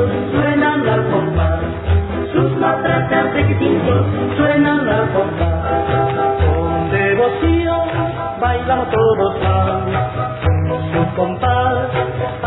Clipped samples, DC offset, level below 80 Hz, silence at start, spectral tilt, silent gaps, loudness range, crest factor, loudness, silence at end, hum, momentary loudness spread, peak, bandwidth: under 0.1%; under 0.1%; -30 dBFS; 0 s; -11.5 dB/octave; none; 2 LU; 12 dB; -16 LUFS; 0 s; none; 5 LU; -2 dBFS; 4.1 kHz